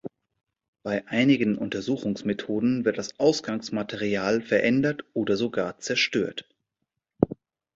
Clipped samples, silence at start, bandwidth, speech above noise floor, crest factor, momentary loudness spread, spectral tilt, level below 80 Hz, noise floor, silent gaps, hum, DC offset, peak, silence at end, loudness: under 0.1%; 0.05 s; 7.8 kHz; 57 dB; 24 dB; 9 LU; -5 dB/octave; -58 dBFS; -82 dBFS; 0.68-0.73 s; none; under 0.1%; -2 dBFS; 0.4 s; -26 LUFS